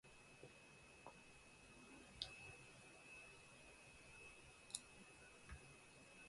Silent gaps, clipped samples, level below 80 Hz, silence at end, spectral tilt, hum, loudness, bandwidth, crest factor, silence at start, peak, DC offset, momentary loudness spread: none; under 0.1%; -74 dBFS; 0 s; -2 dB/octave; none; -59 LUFS; 11.5 kHz; 36 dB; 0.05 s; -26 dBFS; under 0.1%; 11 LU